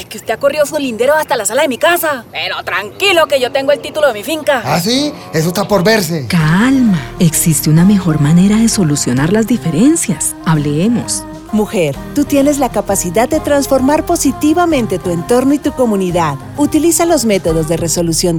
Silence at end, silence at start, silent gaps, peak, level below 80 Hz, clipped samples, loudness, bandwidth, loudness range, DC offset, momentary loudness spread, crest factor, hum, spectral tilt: 0 s; 0 s; none; 0 dBFS; -36 dBFS; under 0.1%; -12 LUFS; over 20 kHz; 3 LU; under 0.1%; 6 LU; 12 dB; none; -5 dB/octave